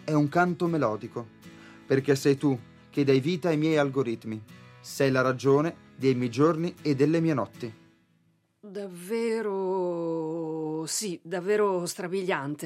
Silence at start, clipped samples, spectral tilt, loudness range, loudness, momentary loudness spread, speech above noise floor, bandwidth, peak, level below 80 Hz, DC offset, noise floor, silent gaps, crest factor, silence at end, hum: 0 s; under 0.1%; -6 dB/octave; 5 LU; -27 LUFS; 15 LU; 42 dB; 15.5 kHz; -10 dBFS; -74 dBFS; under 0.1%; -68 dBFS; none; 18 dB; 0 s; none